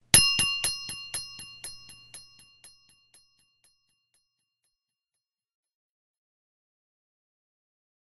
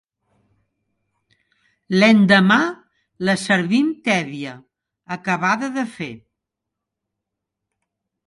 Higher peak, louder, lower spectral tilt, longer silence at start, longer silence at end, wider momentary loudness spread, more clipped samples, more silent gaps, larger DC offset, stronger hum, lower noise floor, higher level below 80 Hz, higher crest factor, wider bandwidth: about the same, -2 dBFS vs 0 dBFS; second, -24 LUFS vs -18 LUFS; second, 0 dB/octave vs -5.5 dB/octave; second, 0.15 s vs 1.9 s; first, 5.4 s vs 2.1 s; first, 28 LU vs 19 LU; neither; neither; neither; neither; first, -89 dBFS vs -83 dBFS; first, -54 dBFS vs -66 dBFS; first, 32 dB vs 20 dB; first, 13 kHz vs 11.5 kHz